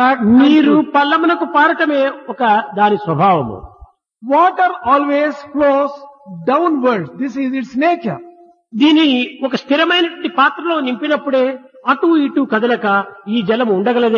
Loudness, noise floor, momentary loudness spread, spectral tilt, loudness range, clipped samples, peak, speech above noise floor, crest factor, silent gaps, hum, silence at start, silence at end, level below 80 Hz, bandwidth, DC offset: -14 LUFS; -44 dBFS; 10 LU; -6.5 dB/octave; 3 LU; under 0.1%; 0 dBFS; 30 dB; 14 dB; none; none; 0 s; 0 s; -54 dBFS; 7 kHz; under 0.1%